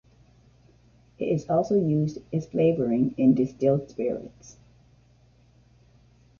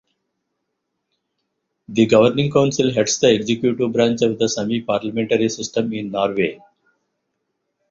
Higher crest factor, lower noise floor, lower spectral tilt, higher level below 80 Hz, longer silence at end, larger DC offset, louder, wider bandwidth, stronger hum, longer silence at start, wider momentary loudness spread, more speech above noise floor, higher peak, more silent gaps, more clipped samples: about the same, 18 dB vs 18 dB; second, -58 dBFS vs -76 dBFS; first, -9 dB/octave vs -5 dB/octave; about the same, -58 dBFS vs -58 dBFS; first, 1.9 s vs 1.35 s; neither; second, -25 LUFS vs -18 LUFS; about the same, 7.2 kHz vs 7.6 kHz; neither; second, 1.2 s vs 1.9 s; about the same, 10 LU vs 8 LU; second, 34 dB vs 58 dB; second, -10 dBFS vs -2 dBFS; neither; neither